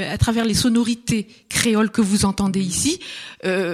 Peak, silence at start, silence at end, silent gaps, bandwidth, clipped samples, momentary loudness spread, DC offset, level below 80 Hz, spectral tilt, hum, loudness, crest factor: -2 dBFS; 0 s; 0 s; none; 14.5 kHz; under 0.1%; 7 LU; under 0.1%; -38 dBFS; -4 dB/octave; none; -20 LUFS; 18 dB